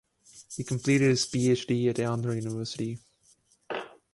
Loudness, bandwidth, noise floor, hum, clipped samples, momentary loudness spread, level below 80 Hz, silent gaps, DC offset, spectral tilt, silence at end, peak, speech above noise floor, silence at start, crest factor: -28 LUFS; 11.5 kHz; -65 dBFS; none; under 0.1%; 14 LU; -64 dBFS; none; under 0.1%; -5.5 dB/octave; 0.25 s; -12 dBFS; 38 dB; 0.35 s; 18 dB